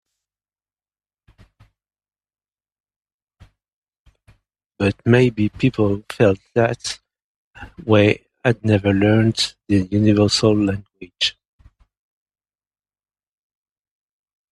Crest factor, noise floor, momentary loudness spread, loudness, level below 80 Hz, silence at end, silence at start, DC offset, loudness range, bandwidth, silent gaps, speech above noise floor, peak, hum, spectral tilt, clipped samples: 20 dB; under -90 dBFS; 7 LU; -18 LUFS; -52 dBFS; 3.25 s; 4.8 s; under 0.1%; 10 LU; 12 kHz; 7.24-7.51 s; over 73 dB; 0 dBFS; 50 Hz at -40 dBFS; -6 dB/octave; under 0.1%